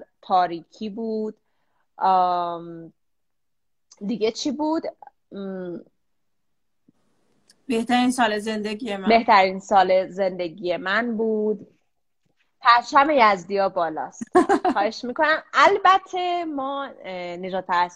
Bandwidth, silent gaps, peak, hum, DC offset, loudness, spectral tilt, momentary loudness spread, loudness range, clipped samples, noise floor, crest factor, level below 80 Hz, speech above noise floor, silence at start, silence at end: 12.5 kHz; none; 0 dBFS; none; under 0.1%; -21 LUFS; -4.5 dB/octave; 16 LU; 10 LU; under 0.1%; -83 dBFS; 22 dB; -62 dBFS; 62 dB; 0 s; 0.05 s